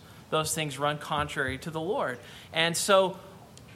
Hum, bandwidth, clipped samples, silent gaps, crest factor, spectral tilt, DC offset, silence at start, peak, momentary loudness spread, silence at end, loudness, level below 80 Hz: none; 16 kHz; under 0.1%; none; 22 dB; -3 dB/octave; under 0.1%; 0 s; -8 dBFS; 11 LU; 0 s; -28 LUFS; -58 dBFS